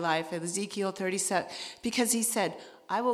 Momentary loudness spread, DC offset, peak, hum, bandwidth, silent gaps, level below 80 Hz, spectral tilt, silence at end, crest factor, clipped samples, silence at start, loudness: 8 LU; under 0.1%; -14 dBFS; none; 16 kHz; none; -74 dBFS; -3 dB/octave; 0 s; 18 dB; under 0.1%; 0 s; -30 LUFS